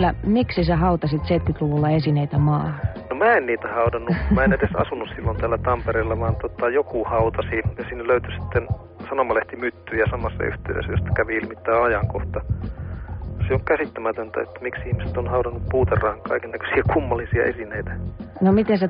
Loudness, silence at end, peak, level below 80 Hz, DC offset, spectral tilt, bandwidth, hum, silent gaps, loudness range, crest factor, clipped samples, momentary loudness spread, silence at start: -22 LUFS; 0 s; -6 dBFS; -34 dBFS; under 0.1%; -6.5 dB/octave; 5.2 kHz; none; none; 4 LU; 16 dB; under 0.1%; 10 LU; 0 s